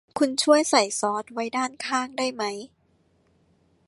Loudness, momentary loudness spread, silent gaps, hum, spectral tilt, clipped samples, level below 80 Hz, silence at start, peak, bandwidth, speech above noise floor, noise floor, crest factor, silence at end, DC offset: -24 LUFS; 11 LU; none; none; -2 dB/octave; under 0.1%; -72 dBFS; 0.15 s; -4 dBFS; 11.5 kHz; 41 dB; -65 dBFS; 22 dB; 1.2 s; under 0.1%